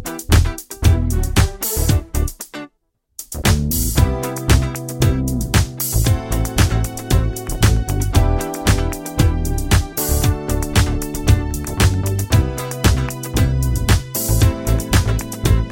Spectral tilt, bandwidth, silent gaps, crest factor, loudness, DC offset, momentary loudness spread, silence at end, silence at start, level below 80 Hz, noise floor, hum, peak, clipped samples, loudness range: -5 dB/octave; 17 kHz; none; 16 dB; -18 LUFS; under 0.1%; 6 LU; 0 s; 0 s; -22 dBFS; -67 dBFS; none; 0 dBFS; under 0.1%; 2 LU